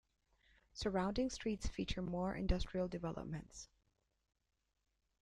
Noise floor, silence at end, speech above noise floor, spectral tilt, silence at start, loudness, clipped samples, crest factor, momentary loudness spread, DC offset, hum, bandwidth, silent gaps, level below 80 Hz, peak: -83 dBFS; 1.6 s; 43 dB; -5.5 dB/octave; 0.75 s; -42 LUFS; under 0.1%; 20 dB; 15 LU; under 0.1%; none; 11 kHz; none; -50 dBFS; -22 dBFS